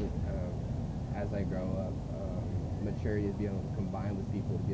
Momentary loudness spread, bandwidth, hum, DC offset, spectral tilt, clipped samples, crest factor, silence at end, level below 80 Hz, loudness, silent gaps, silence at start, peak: 4 LU; 8 kHz; none; under 0.1%; -9 dB/octave; under 0.1%; 14 dB; 0 s; -42 dBFS; -36 LUFS; none; 0 s; -22 dBFS